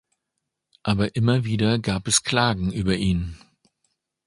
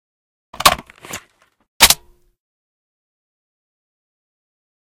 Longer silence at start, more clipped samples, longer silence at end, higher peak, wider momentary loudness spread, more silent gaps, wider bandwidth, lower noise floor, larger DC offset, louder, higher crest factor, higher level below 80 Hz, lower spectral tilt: first, 0.85 s vs 0.6 s; second, under 0.1% vs 0.2%; second, 0.9 s vs 2.95 s; second, -4 dBFS vs 0 dBFS; second, 6 LU vs 21 LU; second, none vs 1.68-1.80 s; second, 11.5 kHz vs 16.5 kHz; first, -81 dBFS vs -51 dBFS; neither; second, -22 LUFS vs -13 LUFS; about the same, 20 dB vs 22 dB; about the same, -42 dBFS vs -44 dBFS; first, -4.5 dB/octave vs 0 dB/octave